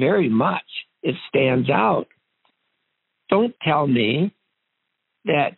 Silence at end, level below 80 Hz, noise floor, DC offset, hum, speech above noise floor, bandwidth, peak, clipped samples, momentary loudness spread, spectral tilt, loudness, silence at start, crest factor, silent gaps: 0.1 s; -66 dBFS; -77 dBFS; under 0.1%; none; 57 dB; 4.2 kHz; -4 dBFS; under 0.1%; 9 LU; -4.5 dB/octave; -21 LUFS; 0 s; 18 dB; none